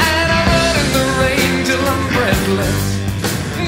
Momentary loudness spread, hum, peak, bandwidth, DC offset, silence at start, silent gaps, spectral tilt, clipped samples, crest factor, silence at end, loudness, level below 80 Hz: 6 LU; none; 0 dBFS; 16.5 kHz; under 0.1%; 0 s; none; -4.5 dB/octave; under 0.1%; 16 dB; 0 s; -15 LUFS; -28 dBFS